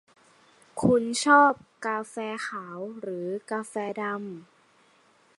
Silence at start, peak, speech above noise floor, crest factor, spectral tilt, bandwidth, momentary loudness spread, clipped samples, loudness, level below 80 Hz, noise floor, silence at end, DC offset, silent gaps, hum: 0.75 s; -8 dBFS; 36 dB; 20 dB; -4.5 dB/octave; 11.5 kHz; 18 LU; under 0.1%; -26 LUFS; -66 dBFS; -62 dBFS; 0.95 s; under 0.1%; none; none